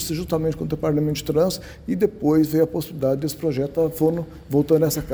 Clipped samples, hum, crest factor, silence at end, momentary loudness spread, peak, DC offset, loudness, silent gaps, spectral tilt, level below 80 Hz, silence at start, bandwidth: under 0.1%; none; 16 dB; 0 s; 6 LU; -6 dBFS; under 0.1%; -22 LUFS; none; -6.5 dB/octave; -44 dBFS; 0 s; over 20 kHz